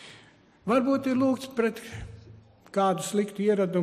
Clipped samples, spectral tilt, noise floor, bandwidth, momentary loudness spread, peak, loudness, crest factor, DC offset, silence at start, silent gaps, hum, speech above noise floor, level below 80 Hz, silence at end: under 0.1%; -6 dB/octave; -56 dBFS; 15 kHz; 17 LU; -12 dBFS; -26 LUFS; 16 dB; under 0.1%; 0 s; none; none; 30 dB; -56 dBFS; 0 s